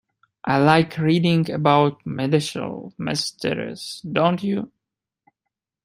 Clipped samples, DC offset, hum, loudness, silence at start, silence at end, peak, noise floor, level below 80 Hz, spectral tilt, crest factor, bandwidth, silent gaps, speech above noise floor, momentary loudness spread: under 0.1%; under 0.1%; none; -21 LUFS; 0.45 s; 1.15 s; -2 dBFS; -85 dBFS; -60 dBFS; -6 dB/octave; 20 dB; 15 kHz; none; 64 dB; 13 LU